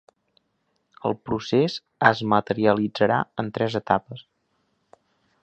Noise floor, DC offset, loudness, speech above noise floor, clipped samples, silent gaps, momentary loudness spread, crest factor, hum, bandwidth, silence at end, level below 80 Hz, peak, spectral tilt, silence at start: -72 dBFS; under 0.1%; -23 LUFS; 50 dB; under 0.1%; none; 9 LU; 24 dB; none; 8.2 kHz; 1.2 s; -60 dBFS; -2 dBFS; -6.5 dB/octave; 1.05 s